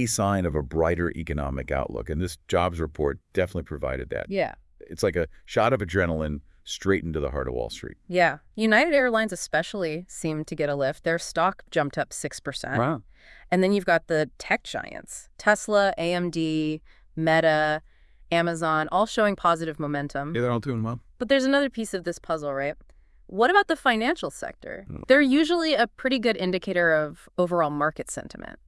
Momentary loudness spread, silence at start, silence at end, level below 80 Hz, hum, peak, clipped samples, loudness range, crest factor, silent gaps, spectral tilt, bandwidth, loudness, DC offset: 12 LU; 0 s; 0.15 s; -46 dBFS; none; -4 dBFS; under 0.1%; 4 LU; 22 dB; none; -5 dB/octave; 12 kHz; -25 LUFS; under 0.1%